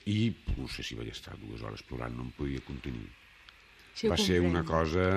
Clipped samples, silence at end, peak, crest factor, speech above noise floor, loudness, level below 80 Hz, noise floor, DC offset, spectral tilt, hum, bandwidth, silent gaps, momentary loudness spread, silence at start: under 0.1%; 0 s; -12 dBFS; 20 dB; 25 dB; -33 LUFS; -46 dBFS; -57 dBFS; under 0.1%; -5.5 dB/octave; none; 14 kHz; none; 16 LU; 0.05 s